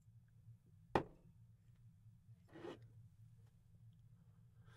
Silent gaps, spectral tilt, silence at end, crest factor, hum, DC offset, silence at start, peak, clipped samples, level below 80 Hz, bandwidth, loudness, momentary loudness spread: none; -7 dB/octave; 0 s; 34 dB; none; under 0.1%; 0 s; -20 dBFS; under 0.1%; -72 dBFS; 12 kHz; -47 LUFS; 25 LU